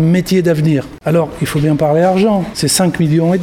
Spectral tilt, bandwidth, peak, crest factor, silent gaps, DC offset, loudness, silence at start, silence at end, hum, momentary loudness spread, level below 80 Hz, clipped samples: -6 dB/octave; 16.5 kHz; 0 dBFS; 12 dB; none; under 0.1%; -13 LUFS; 0 s; 0 s; none; 4 LU; -40 dBFS; under 0.1%